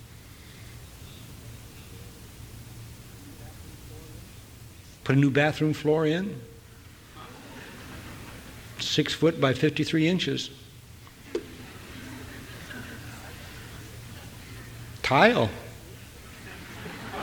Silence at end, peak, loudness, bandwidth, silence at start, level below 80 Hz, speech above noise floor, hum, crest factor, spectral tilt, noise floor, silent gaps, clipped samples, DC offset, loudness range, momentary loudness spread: 0 s; -6 dBFS; -25 LUFS; over 20 kHz; 0 s; -52 dBFS; 25 dB; none; 24 dB; -5.5 dB/octave; -49 dBFS; none; under 0.1%; under 0.1%; 18 LU; 23 LU